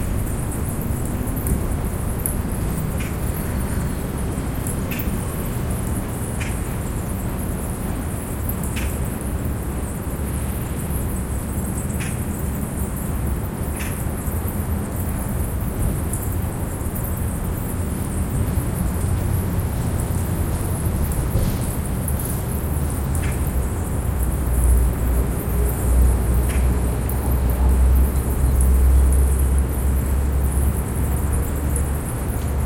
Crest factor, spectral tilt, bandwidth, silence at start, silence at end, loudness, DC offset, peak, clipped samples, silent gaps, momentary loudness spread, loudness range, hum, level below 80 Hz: 16 dB; -6 dB/octave; 17 kHz; 0 s; 0 s; -23 LUFS; under 0.1%; -4 dBFS; under 0.1%; none; 7 LU; 6 LU; none; -24 dBFS